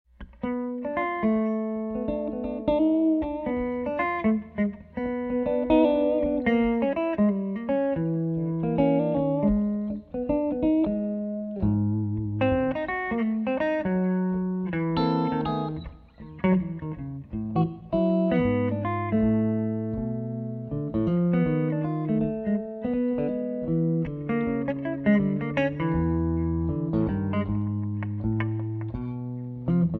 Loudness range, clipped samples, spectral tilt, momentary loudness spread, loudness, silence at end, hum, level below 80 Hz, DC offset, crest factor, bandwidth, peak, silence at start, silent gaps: 3 LU; under 0.1%; -10.5 dB/octave; 8 LU; -26 LUFS; 0 s; none; -46 dBFS; under 0.1%; 18 dB; 4.7 kHz; -8 dBFS; 0.2 s; none